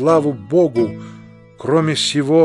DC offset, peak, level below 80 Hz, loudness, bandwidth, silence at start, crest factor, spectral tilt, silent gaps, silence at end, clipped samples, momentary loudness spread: under 0.1%; -2 dBFS; -58 dBFS; -17 LUFS; 11.5 kHz; 0 s; 14 dB; -5.5 dB/octave; none; 0 s; under 0.1%; 14 LU